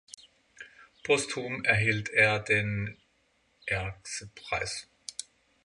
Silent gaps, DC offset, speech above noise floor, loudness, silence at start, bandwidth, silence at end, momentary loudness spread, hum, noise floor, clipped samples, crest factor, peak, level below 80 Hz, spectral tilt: none; under 0.1%; 41 dB; -28 LUFS; 0.6 s; 11.5 kHz; 0.45 s; 25 LU; none; -70 dBFS; under 0.1%; 22 dB; -8 dBFS; -56 dBFS; -4 dB/octave